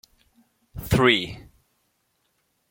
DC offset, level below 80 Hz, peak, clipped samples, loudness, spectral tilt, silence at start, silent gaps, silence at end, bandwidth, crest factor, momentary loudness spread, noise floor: under 0.1%; -46 dBFS; -4 dBFS; under 0.1%; -21 LUFS; -5 dB/octave; 0.75 s; none; 1.3 s; 17 kHz; 24 dB; 25 LU; -71 dBFS